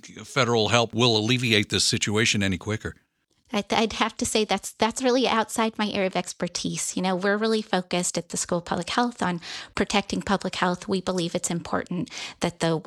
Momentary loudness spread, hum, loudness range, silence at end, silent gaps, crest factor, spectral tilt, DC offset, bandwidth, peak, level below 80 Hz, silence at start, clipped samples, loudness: 8 LU; none; 4 LU; 0.05 s; none; 22 dB; -3.5 dB/octave; under 0.1%; 14.5 kHz; -4 dBFS; -54 dBFS; 0.05 s; under 0.1%; -25 LUFS